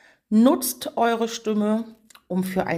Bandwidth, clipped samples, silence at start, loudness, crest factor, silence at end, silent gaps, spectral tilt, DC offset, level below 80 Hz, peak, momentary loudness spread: 16 kHz; under 0.1%; 0.3 s; -23 LUFS; 18 dB; 0 s; none; -5 dB/octave; under 0.1%; -62 dBFS; -6 dBFS; 9 LU